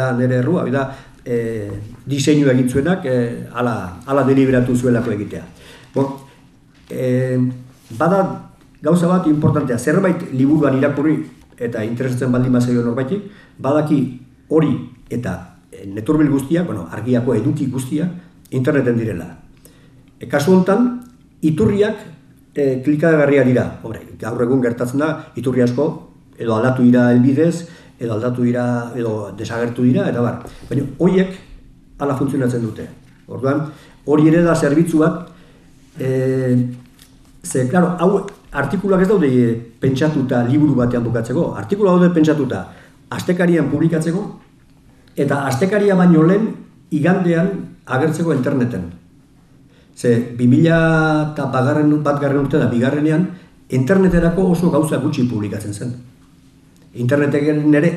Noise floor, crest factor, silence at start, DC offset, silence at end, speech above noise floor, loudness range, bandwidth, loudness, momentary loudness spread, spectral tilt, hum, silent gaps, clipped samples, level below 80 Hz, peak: -48 dBFS; 16 dB; 0 s; under 0.1%; 0 s; 32 dB; 4 LU; 13.5 kHz; -17 LUFS; 14 LU; -7.5 dB/octave; none; none; under 0.1%; -44 dBFS; -2 dBFS